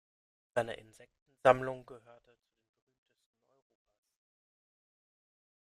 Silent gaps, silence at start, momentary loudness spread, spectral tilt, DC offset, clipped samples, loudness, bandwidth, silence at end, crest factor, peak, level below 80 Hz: 1.22-1.26 s; 0.55 s; 18 LU; -5.5 dB/octave; under 0.1%; under 0.1%; -32 LUFS; 13 kHz; 3.8 s; 30 dB; -10 dBFS; -70 dBFS